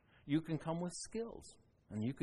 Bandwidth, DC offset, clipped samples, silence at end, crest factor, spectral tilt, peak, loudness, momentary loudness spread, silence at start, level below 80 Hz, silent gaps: 11.5 kHz; under 0.1%; under 0.1%; 0 s; 18 dB; -6 dB/octave; -24 dBFS; -42 LUFS; 13 LU; 0.25 s; -68 dBFS; none